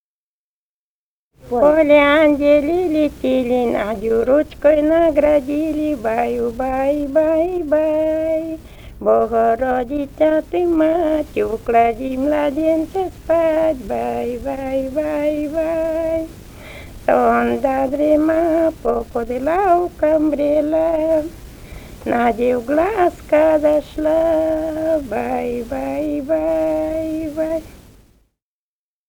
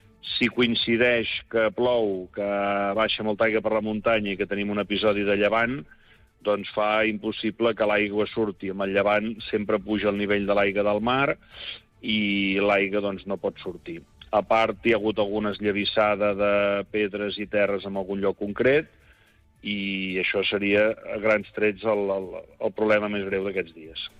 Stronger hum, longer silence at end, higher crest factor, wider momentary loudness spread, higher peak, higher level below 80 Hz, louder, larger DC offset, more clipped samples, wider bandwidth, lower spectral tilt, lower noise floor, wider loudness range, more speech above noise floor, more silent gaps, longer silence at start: neither; first, 1.35 s vs 0.15 s; about the same, 16 dB vs 14 dB; about the same, 9 LU vs 9 LU; first, 0 dBFS vs -10 dBFS; first, -40 dBFS vs -54 dBFS; first, -17 LUFS vs -24 LUFS; neither; neither; first, over 20 kHz vs 7.8 kHz; about the same, -6.5 dB/octave vs -7 dB/octave; first, under -90 dBFS vs -59 dBFS; first, 5 LU vs 2 LU; first, over 73 dB vs 34 dB; neither; first, 1.45 s vs 0.25 s